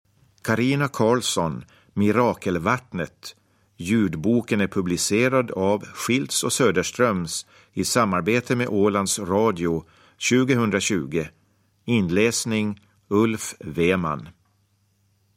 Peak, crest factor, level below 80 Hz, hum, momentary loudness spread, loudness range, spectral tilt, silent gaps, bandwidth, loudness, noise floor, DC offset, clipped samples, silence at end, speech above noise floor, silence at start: -4 dBFS; 18 dB; -54 dBFS; none; 11 LU; 2 LU; -4.5 dB/octave; none; 16.5 kHz; -22 LUFS; -65 dBFS; under 0.1%; under 0.1%; 1.05 s; 43 dB; 0.45 s